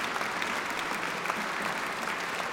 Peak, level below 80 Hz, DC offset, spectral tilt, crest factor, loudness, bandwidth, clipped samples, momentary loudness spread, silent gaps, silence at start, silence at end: -12 dBFS; -68 dBFS; under 0.1%; -2 dB/octave; 20 dB; -31 LUFS; over 20 kHz; under 0.1%; 1 LU; none; 0 s; 0 s